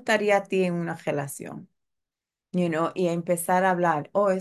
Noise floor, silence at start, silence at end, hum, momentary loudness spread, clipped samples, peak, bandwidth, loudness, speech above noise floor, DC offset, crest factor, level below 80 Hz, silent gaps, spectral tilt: -88 dBFS; 0.05 s; 0 s; none; 12 LU; under 0.1%; -8 dBFS; 12.5 kHz; -25 LUFS; 64 dB; under 0.1%; 18 dB; -74 dBFS; none; -5.5 dB/octave